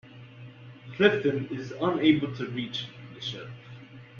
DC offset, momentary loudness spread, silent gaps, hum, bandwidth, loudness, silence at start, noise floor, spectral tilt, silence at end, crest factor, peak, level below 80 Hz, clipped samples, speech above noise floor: under 0.1%; 24 LU; none; none; 7 kHz; -27 LUFS; 0.05 s; -47 dBFS; -6.5 dB/octave; 0 s; 22 dB; -8 dBFS; -64 dBFS; under 0.1%; 21 dB